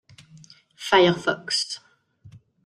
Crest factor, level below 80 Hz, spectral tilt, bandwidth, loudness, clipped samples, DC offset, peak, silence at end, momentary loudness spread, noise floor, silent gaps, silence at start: 22 dB; -64 dBFS; -4 dB/octave; 13 kHz; -21 LUFS; under 0.1%; under 0.1%; -4 dBFS; 0.4 s; 17 LU; -53 dBFS; none; 0.8 s